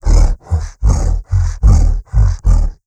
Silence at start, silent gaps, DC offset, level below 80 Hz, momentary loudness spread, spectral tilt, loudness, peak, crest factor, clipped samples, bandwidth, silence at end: 0.05 s; none; under 0.1%; -12 dBFS; 5 LU; -7 dB/octave; -15 LUFS; 0 dBFS; 10 dB; under 0.1%; 8.8 kHz; 0.15 s